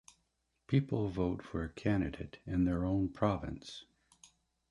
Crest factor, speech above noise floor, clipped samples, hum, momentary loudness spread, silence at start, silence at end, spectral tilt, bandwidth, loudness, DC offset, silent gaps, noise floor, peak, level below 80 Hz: 20 dB; 46 dB; under 0.1%; none; 13 LU; 0.7 s; 0.9 s; -8 dB/octave; 11.5 kHz; -35 LUFS; under 0.1%; none; -80 dBFS; -16 dBFS; -52 dBFS